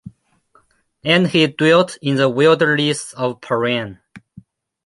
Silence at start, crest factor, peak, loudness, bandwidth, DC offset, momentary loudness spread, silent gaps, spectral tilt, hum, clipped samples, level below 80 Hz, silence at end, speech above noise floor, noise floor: 0.05 s; 16 dB; -2 dBFS; -16 LUFS; 11.5 kHz; under 0.1%; 10 LU; none; -5 dB/octave; none; under 0.1%; -60 dBFS; 0.65 s; 41 dB; -57 dBFS